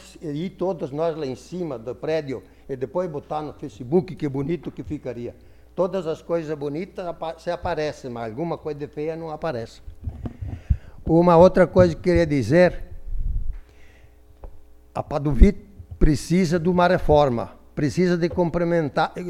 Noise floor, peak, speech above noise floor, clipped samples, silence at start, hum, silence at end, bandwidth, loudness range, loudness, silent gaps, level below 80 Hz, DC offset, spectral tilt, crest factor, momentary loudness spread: -49 dBFS; 0 dBFS; 27 dB; under 0.1%; 0 s; none; 0 s; 12.5 kHz; 10 LU; -23 LUFS; none; -30 dBFS; under 0.1%; -7.5 dB/octave; 22 dB; 17 LU